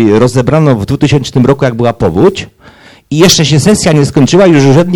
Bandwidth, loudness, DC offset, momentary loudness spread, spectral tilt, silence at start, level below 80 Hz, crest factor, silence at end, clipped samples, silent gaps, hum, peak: 18.5 kHz; -7 LUFS; under 0.1%; 5 LU; -5.5 dB/octave; 0 s; -34 dBFS; 8 dB; 0 s; 3%; none; none; 0 dBFS